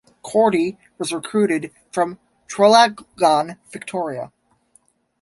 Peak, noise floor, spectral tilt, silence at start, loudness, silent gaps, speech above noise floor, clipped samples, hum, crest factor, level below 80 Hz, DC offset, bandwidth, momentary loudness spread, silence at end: -2 dBFS; -60 dBFS; -4 dB/octave; 0.25 s; -19 LUFS; none; 41 dB; under 0.1%; none; 18 dB; -64 dBFS; under 0.1%; 11.5 kHz; 16 LU; 0.95 s